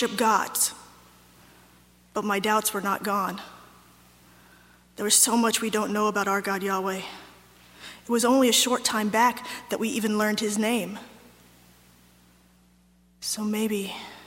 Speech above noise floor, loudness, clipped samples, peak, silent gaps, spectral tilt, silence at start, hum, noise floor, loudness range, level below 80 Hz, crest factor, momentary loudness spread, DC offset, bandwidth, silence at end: 35 dB; -24 LUFS; under 0.1%; -6 dBFS; none; -2.5 dB/octave; 0 s; 60 Hz at -60 dBFS; -60 dBFS; 7 LU; -66 dBFS; 20 dB; 16 LU; under 0.1%; 16.5 kHz; 0 s